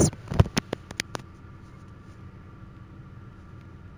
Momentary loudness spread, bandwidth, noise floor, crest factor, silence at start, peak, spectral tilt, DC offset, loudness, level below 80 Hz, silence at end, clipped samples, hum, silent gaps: 22 LU; over 20 kHz; -46 dBFS; 28 dB; 0 s; -2 dBFS; -5 dB/octave; under 0.1%; -28 LUFS; -42 dBFS; 0 s; under 0.1%; none; none